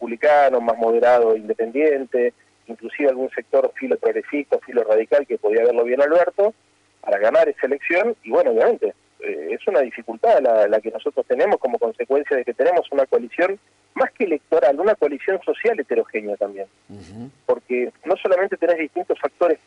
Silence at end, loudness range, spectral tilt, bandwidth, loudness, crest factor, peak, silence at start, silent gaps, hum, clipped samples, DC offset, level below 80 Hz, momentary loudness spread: 0.1 s; 4 LU; -6 dB/octave; 8.6 kHz; -20 LUFS; 12 dB; -8 dBFS; 0 s; none; none; under 0.1%; under 0.1%; -68 dBFS; 10 LU